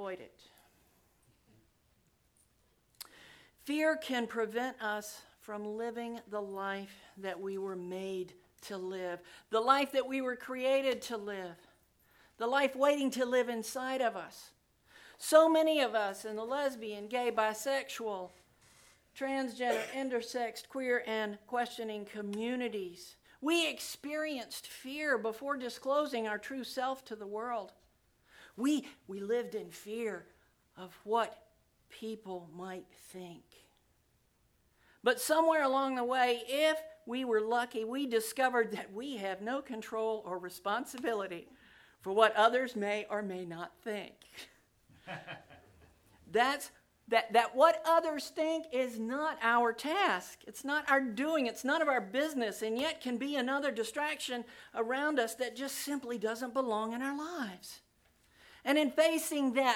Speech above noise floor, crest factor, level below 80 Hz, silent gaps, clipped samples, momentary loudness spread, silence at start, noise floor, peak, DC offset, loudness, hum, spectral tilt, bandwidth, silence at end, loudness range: 39 dB; 24 dB; -76 dBFS; none; under 0.1%; 17 LU; 0 s; -73 dBFS; -10 dBFS; under 0.1%; -34 LUFS; none; -3 dB/octave; 19 kHz; 0 s; 9 LU